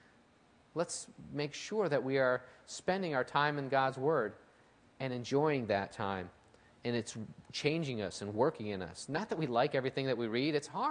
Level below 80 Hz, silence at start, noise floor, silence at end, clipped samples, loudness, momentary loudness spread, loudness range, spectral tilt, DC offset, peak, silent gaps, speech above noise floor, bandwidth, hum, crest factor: -74 dBFS; 0.75 s; -66 dBFS; 0 s; under 0.1%; -35 LUFS; 11 LU; 4 LU; -5 dB/octave; under 0.1%; -14 dBFS; none; 31 dB; 10.5 kHz; none; 20 dB